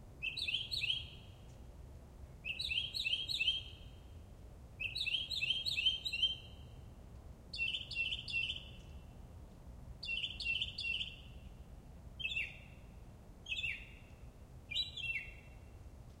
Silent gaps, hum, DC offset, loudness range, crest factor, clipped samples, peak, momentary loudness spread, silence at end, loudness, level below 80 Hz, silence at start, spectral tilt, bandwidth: none; none; under 0.1%; 6 LU; 20 dB; under 0.1%; -22 dBFS; 22 LU; 0 s; -37 LUFS; -56 dBFS; 0 s; -2 dB/octave; 16 kHz